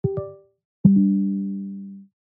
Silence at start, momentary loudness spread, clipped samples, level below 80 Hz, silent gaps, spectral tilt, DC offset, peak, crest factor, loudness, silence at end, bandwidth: 0.05 s; 21 LU; under 0.1%; -54 dBFS; 0.65-0.84 s; -16.5 dB/octave; under 0.1%; -4 dBFS; 20 dB; -21 LUFS; 0.3 s; 1.3 kHz